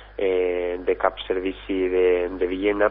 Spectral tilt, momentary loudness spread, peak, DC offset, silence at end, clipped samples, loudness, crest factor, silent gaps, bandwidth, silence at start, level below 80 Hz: -9.5 dB/octave; 6 LU; -4 dBFS; under 0.1%; 0 s; under 0.1%; -23 LUFS; 18 dB; none; 4 kHz; 0 s; -44 dBFS